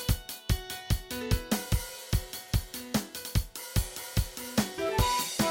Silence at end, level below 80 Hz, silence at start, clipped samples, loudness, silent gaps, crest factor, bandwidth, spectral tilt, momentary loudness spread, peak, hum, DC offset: 0 s; -36 dBFS; 0 s; under 0.1%; -32 LUFS; none; 18 dB; 17 kHz; -4.5 dB/octave; 5 LU; -12 dBFS; none; under 0.1%